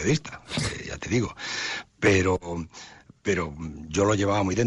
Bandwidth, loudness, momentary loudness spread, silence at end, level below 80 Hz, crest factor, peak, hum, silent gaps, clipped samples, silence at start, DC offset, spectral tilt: 11.5 kHz; -26 LUFS; 13 LU; 0 s; -48 dBFS; 16 dB; -10 dBFS; none; none; under 0.1%; 0 s; under 0.1%; -5 dB/octave